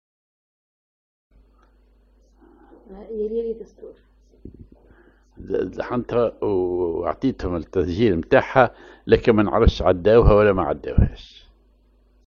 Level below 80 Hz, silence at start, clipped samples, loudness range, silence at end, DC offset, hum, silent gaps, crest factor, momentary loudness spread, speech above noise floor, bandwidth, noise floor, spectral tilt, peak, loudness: -32 dBFS; 2.9 s; under 0.1%; 16 LU; 1.05 s; under 0.1%; none; none; 22 dB; 12 LU; 38 dB; 7 kHz; -57 dBFS; -8.5 dB/octave; 0 dBFS; -20 LUFS